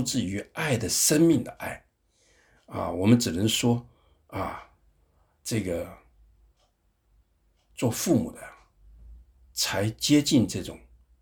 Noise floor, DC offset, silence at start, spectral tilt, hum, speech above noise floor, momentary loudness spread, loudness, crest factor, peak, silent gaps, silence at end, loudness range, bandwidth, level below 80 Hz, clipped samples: -69 dBFS; under 0.1%; 0 s; -4.5 dB/octave; none; 44 dB; 18 LU; -26 LUFS; 22 dB; -6 dBFS; none; 0.45 s; 11 LU; over 20 kHz; -54 dBFS; under 0.1%